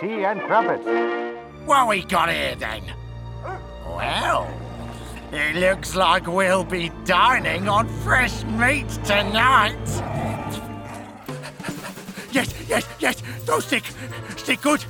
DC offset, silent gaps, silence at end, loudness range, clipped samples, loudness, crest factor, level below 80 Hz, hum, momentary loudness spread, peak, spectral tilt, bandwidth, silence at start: under 0.1%; none; 0 s; 8 LU; under 0.1%; -21 LUFS; 18 dB; -40 dBFS; none; 17 LU; -4 dBFS; -4 dB/octave; over 20 kHz; 0 s